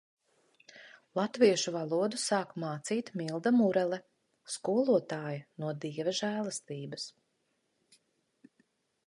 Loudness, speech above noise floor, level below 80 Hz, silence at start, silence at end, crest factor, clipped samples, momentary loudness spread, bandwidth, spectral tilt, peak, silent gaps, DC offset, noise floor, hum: -32 LUFS; 47 dB; -84 dBFS; 0.75 s; 1.95 s; 22 dB; under 0.1%; 14 LU; 11.5 kHz; -4.5 dB/octave; -12 dBFS; none; under 0.1%; -78 dBFS; none